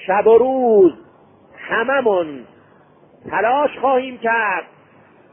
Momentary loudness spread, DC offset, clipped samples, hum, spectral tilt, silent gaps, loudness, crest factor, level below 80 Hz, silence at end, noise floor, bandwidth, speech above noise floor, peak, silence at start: 12 LU; under 0.1%; under 0.1%; none; -10 dB/octave; none; -16 LUFS; 16 dB; -60 dBFS; 0.7 s; -50 dBFS; 3.6 kHz; 34 dB; -2 dBFS; 0 s